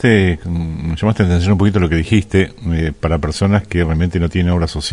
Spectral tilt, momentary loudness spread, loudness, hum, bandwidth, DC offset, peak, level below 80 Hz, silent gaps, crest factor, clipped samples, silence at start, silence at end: -7 dB/octave; 6 LU; -16 LUFS; none; 11 kHz; under 0.1%; 0 dBFS; -30 dBFS; none; 14 dB; under 0.1%; 0 s; 0 s